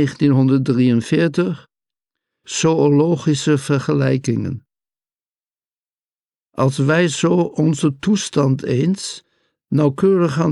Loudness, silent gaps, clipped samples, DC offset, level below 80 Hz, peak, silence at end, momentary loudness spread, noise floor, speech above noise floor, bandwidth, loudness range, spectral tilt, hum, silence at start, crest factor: -17 LUFS; 5.26-5.43 s, 5.78-5.83 s, 5.90-5.94 s, 6.25-6.29 s; under 0.1%; under 0.1%; -56 dBFS; -6 dBFS; 0 s; 9 LU; under -90 dBFS; over 74 dB; 11.5 kHz; 5 LU; -6.5 dB/octave; none; 0 s; 12 dB